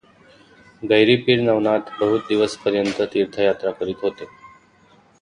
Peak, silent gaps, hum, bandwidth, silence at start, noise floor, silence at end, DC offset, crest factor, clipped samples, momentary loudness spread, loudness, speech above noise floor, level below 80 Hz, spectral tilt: -2 dBFS; none; none; 10.5 kHz; 0.8 s; -54 dBFS; 0.75 s; under 0.1%; 18 dB; under 0.1%; 11 LU; -19 LUFS; 35 dB; -58 dBFS; -5.5 dB/octave